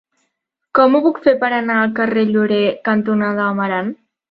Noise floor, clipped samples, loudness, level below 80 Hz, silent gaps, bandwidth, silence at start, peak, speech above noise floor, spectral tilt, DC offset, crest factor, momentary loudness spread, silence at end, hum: -73 dBFS; under 0.1%; -16 LUFS; -62 dBFS; none; 5.2 kHz; 0.75 s; -2 dBFS; 58 dB; -9 dB/octave; under 0.1%; 16 dB; 6 LU; 0.35 s; none